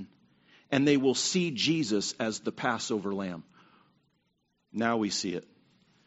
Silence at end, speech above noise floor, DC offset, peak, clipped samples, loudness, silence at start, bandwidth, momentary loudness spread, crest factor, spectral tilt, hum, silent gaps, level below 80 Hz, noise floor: 0.65 s; 47 dB; under 0.1%; -10 dBFS; under 0.1%; -29 LUFS; 0 s; 8 kHz; 14 LU; 22 dB; -3.5 dB/octave; none; none; -72 dBFS; -76 dBFS